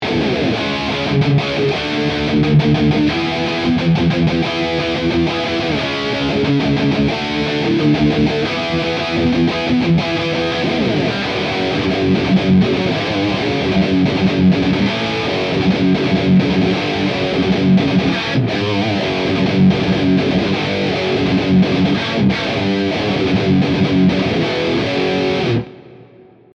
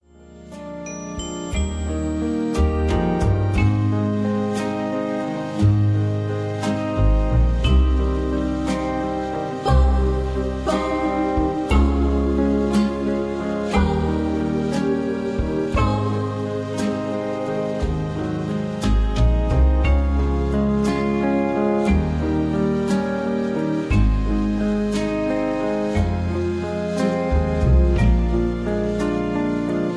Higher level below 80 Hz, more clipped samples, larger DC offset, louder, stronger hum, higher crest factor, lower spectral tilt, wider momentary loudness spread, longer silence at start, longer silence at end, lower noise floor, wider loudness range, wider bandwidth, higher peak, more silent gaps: second, -40 dBFS vs -24 dBFS; neither; neither; first, -16 LUFS vs -21 LUFS; neither; about the same, 12 dB vs 14 dB; about the same, -6.5 dB/octave vs -7.5 dB/octave; about the same, 4 LU vs 6 LU; second, 0 s vs 0.2 s; first, 0.5 s vs 0 s; about the same, -44 dBFS vs -43 dBFS; about the same, 2 LU vs 3 LU; second, 7.8 kHz vs 11 kHz; about the same, -4 dBFS vs -6 dBFS; neither